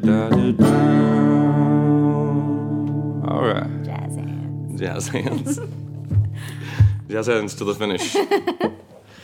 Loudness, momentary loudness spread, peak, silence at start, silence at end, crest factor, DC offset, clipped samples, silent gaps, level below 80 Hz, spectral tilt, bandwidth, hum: -20 LUFS; 12 LU; -2 dBFS; 0 s; 0 s; 18 dB; under 0.1%; under 0.1%; none; -44 dBFS; -7 dB/octave; 15.5 kHz; none